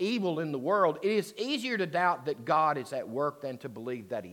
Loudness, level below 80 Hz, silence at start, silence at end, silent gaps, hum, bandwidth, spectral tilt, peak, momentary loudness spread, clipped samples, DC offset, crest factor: -30 LUFS; -82 dBFS; 0 s; 0 s; none; none; 17.5 kHz; -5.5 dB/octave; -12 dBFS; 11 LU; under 0.1%; under 0.1%; 18 dB